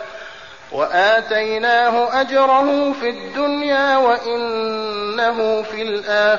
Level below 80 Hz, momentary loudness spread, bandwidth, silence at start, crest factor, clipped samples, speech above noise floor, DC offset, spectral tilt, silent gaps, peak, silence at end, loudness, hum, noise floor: -58 dBFS; 9 LU; 7.2 kHz; 0 s; 12 dB; under 0.1%; 20 dB; 0.4%; -0.5 dB/octave; none; -4 dBFS; 0 s; -17 LUFS; none; -37 dBFS